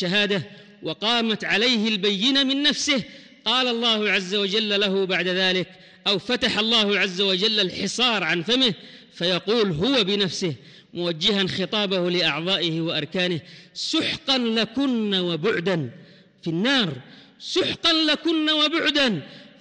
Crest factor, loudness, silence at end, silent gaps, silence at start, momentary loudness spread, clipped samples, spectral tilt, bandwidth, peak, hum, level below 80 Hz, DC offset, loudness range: 14 dB; -21 LUFS; 0.15 s; none; 0 s; 10 LU; under 0.1%; -4 dB/octave; 10.5 kHz; -8 dBFS; none; -60 dBFS; under 0.1%; 3 LU